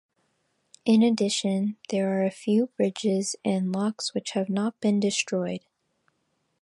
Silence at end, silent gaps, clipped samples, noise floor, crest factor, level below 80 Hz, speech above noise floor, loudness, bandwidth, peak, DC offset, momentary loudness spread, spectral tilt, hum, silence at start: 1.05 s; none; under 0.1%; -74 dBFS; 16 dB; -74 dBFS; 49 dB; -26 LUFS; 11.5 kHz; -10 dBFS; under 0.1%; 7 LU; -5 dB/octave; none; 0.85 s